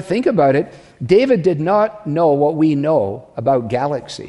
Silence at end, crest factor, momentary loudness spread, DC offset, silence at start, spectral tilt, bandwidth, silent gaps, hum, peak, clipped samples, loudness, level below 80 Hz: 0 s; 14 dB; 8 LU; under 0.1%; 0 s; -7.5 dB/octave; 11.5 kHz; none; none; -2 dBFS; under 0.1%; -16 LUFS; -52 dBFS